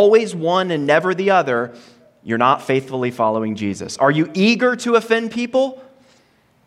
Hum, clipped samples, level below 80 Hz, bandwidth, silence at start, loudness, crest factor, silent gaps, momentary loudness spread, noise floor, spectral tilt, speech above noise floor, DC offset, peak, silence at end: none; under 0.1%; -66 dBFS; 13 kHz; 0 s; -18 LUFS; 16 dB; none; 8 LU; -57 dBFS; -5.5 dB/octave; 40 dB; under 0.1%; -2 dBFS; 0.85 s